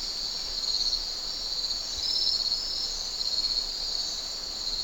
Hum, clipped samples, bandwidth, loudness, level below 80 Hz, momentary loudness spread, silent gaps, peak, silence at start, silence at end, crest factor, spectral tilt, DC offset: none; under 0.1%; 17 kHz; -27 LUFS; -46 dBFS; 6 LU; none; -14 dBFS; 0 s; 0 s; 16 dB; 0.5 dB/octave; under 0.1%